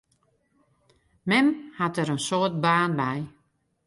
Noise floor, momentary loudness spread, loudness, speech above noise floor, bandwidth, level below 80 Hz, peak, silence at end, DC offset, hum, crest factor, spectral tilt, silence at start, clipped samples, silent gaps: -70 dBFS; 11 LU; -25 LUFS; 45 dB; 11.5 kHz; -66 dBFS; -8 dBFS; 0.6 s; under 0.1%; none; 18 dB; -5 dB/octave; 1.25 s; under 0.1%; none